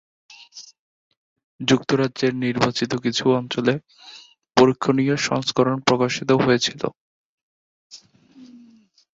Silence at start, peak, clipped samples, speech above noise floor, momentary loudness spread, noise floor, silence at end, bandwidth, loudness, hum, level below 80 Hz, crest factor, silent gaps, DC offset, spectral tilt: 0.55 s; 0 dBFS; under 0.1%; 33 dB; 16 LU; -53 dBFS; 0.6 s; 7.8 kHz; -20 LUFS; none; -60 dBFS; 22 dB; 0.79-1.11 s, 1.17-1.36 s, 1.44-1.59 s, 6.97-7.90 s; under 0.1%; -5 dB/octave